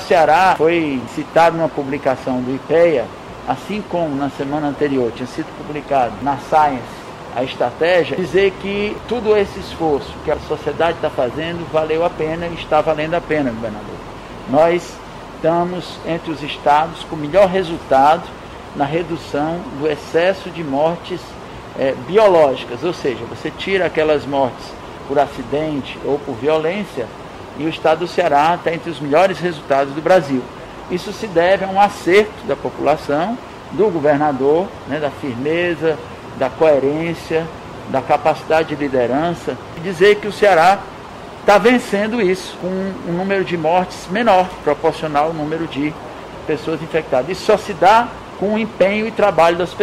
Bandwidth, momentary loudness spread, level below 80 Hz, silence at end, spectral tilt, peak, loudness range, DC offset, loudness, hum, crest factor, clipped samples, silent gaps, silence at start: 15 kHz; 13 LU; -44 dBFS; 0 s; -6 dB/octave; -2 dBFS; 4 LU; under 0.1%; -17 LUFS; none; 16 dB; under 0.1%; none; 0 s